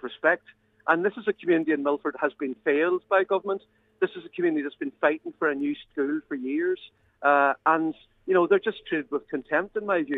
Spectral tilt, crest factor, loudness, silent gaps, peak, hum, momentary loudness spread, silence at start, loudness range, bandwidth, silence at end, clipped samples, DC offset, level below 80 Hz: -8 dB/octave; 20 dB; -26 LUFS; none; -6 dBFS; none; 9 LU; 0.05 s; 3 LU; 4 kHz; 0 s; under 0.1%; under 0.1%; -70 dBFS